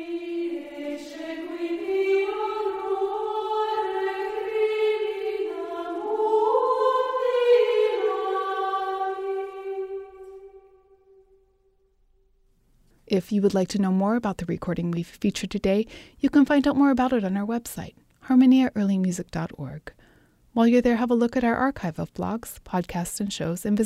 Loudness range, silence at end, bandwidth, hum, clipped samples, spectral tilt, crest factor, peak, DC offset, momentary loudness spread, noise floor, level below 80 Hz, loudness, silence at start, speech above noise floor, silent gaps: 8 LU; 0 s; 15.5 kHz; none; under 0.1%; -6 dB/octave; 16 dB; -8 dBFS; under 0.1%; 14 LU; -64 dBFS; -54 dBFS; -25 LUFS; 0 s; 41 dB; none